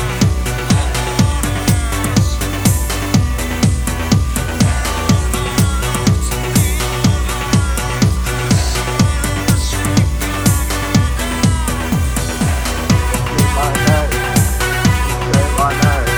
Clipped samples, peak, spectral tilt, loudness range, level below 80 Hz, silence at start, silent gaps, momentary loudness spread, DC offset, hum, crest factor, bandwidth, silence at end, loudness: under 0.1%; 0 dBFS; -4.5 dB/octave; 1 LU; -20 dBFS; 0 s; none; 3 LU; under 0.1%; none; 14 dB; over 20 kHz; 0 s; -15 LUFS